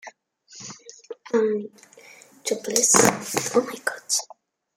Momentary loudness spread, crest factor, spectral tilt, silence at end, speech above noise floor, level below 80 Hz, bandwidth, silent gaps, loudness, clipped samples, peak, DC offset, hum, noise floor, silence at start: 25 LU; 24 dB; -2 dB/octave; 0.55 s; 30 dB; -68 dBFS; 16.5 kHz; none; -22 LUFS; under 0.1%; 0 dBFS; under 0.1%; none; -52 dBFS; 0.05 s